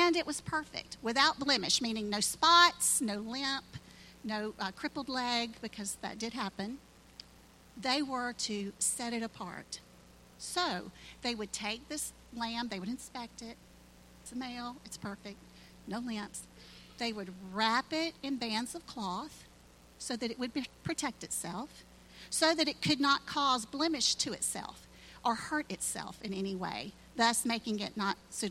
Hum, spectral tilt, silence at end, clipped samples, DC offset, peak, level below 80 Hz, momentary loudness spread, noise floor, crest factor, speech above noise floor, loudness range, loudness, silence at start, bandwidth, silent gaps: none; -2 dB/octave; 0 s; under 0.1%; under 0.1%; -10 dBFS; -64 dBFS; 18 LU; -59 dBFS; 26 dB; 24 dB; 13 LU; -33 LUFS; 0 s; 16.5 kHz; none